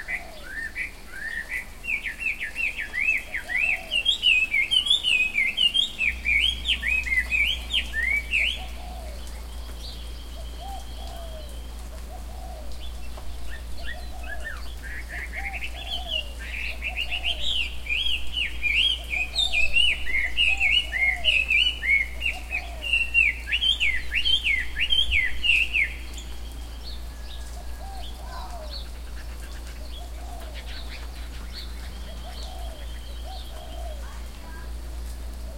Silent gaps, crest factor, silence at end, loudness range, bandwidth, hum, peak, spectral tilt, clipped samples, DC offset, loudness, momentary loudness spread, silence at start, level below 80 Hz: none; 18 dB; 0 s; 17 LU; 16.5 kHz; none; -8 dBFS; -1.5 dB/octave; under 0.1%; 0.6%; -23 LUFS; 19 LU; 0 s; -36 dBFS